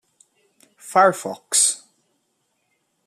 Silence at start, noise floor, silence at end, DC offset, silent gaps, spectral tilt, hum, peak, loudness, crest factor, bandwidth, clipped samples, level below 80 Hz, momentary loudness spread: 0.85 s; -71 dBFS; 1.3 s; under 0.1%; none; -1 dB/octave; none; -4 dBFS; -18 LUFS; 20 dB; 15 kHz; under 0.1%; -82 dBFS; 13 LU